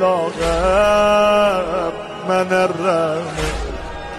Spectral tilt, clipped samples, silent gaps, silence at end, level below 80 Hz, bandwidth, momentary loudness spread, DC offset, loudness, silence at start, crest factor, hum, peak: -5 dB/octave; under 0.1%; none; 0 s; -32 dBFS; 13 kHz; 12 LU; under 0.1%; -17 LUFS; 0 s; 12 dB; none; -4 dBFS